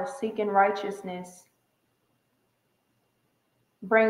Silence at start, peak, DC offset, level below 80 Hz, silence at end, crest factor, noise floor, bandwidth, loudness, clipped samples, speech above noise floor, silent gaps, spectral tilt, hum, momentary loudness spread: 0 s; -10 dBFS; under 0.1%; -80 dBFS; 0 s; 20 dB; -73 dBFS; 14 kHz; -27 LUFS; under 0.1%; 47 dB; none; -5.5 dB/octave; none; 20 LU